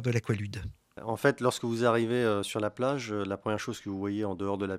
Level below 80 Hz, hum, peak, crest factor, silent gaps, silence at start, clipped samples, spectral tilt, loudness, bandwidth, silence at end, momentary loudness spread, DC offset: -58 dBFS; none; -10 dBFS; 20 dB; none; 0 s; under 0.1%; -6 dB/octave; -30 LUFS; 15.5 kHz; 0 s; 10 LU; under 0.1%